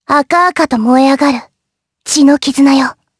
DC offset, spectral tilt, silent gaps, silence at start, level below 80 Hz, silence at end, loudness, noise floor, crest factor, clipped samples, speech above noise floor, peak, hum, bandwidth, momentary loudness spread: under 0.1%; -3 dB/octave; none; 0.1 s; -52 dBFS; 0.25 s; -10 LUFS; -73 dBFS; 10 dB; under 0.1%; 64 dB; 0 dBFS; none; 11 kHz; 6 LU